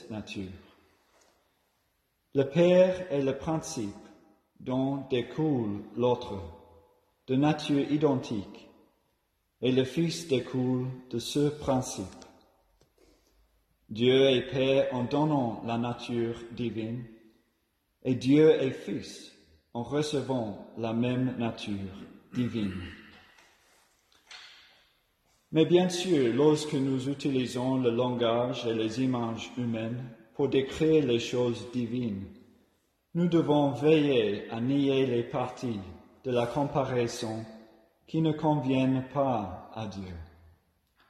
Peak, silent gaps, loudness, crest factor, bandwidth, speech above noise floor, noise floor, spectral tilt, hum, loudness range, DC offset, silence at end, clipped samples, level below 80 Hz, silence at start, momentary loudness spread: -10 dBFS; none; -29 LUFS; 20 dB; 13 kHz; 47 dB; -75 dBFS; -6.5 dB/octave; none; 5 LU; under 0.1%; 0.85 s; under 0.1%; -62 dBFS; 0 s; 16 LU